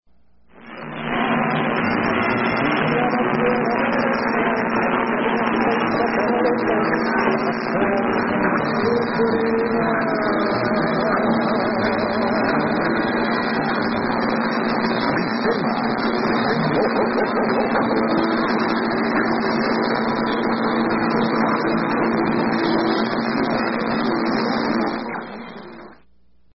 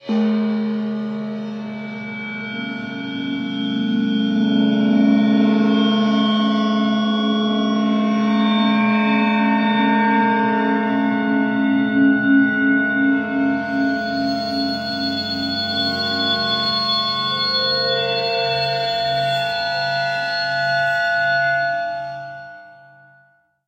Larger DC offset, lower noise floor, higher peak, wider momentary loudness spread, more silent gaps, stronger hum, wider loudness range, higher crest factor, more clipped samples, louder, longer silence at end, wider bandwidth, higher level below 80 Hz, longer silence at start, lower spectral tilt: first, 0.2% vs under 0.1%; first, -61 dBFS vs -57 dBFS; about the same, -6 dBFS vs -6 dBFS; second, 2 LU vs 10 LU; neither; neither; second, 1 LU vs 4 LU; about the same, 14 dB vs 14 dB; neither; about the same, -20 LUFS vs -18 LUFS; second, 0.6 s vs 0.95 s; second, 5.8 kHz vs 8 kHz; first, -50 dBFS vs -62 dBFS; first, 0.55 s vs 0.05 s; first, -10 dB/octave vs -6 dB/octave